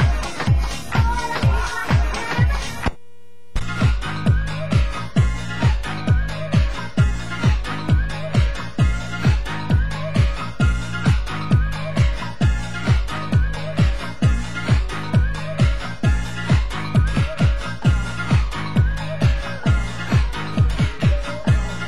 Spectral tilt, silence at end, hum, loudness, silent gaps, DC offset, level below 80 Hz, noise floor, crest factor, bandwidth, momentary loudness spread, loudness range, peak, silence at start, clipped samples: -6.5 dB/octave; 0 s; none; -21 LUFS; none; 3%; -24 dBFS; -53 dBFS; 14 dB; 12.5 kHz; 3 LU; 1 LU; -4 dBFS; 0 s; under 0.1%